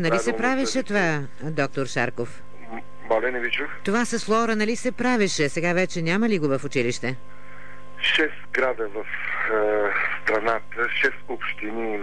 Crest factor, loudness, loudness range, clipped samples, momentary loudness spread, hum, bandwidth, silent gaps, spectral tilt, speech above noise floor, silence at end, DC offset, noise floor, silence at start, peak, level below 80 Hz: 14 dB; -24 LUFS; 3 LU; under 0.1%; 9 LU; 50 Hz at -55 dBFS; 11 kHz; none; -4.5 dB/octave; 21 dB; 0 s; 3%; -45 dBFS; 0 s; -10 dBFS; -56 dBFS